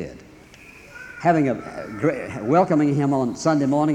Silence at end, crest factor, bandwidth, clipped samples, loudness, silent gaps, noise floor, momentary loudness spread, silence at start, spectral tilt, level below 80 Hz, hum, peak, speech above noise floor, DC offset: 0 s; 16 dB; 10 kHz; under 0.1%; -21 LUFS; none; -46 dBFS; 18 LU; 0 s; -7 dB/octave; -56 dBFS; none; -4 dBFS; 26 dB; under 0.1%